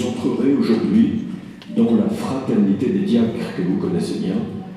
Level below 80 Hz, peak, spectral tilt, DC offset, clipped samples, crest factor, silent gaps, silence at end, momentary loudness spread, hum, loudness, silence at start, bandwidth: -58 dBFS; -6 dBFS; -7.5 dB/octave; under 0.1%; under 0.1%; 14 dB; none; 0 s; 8 LU; none; -19 LUFS; 0 s; 12 kHz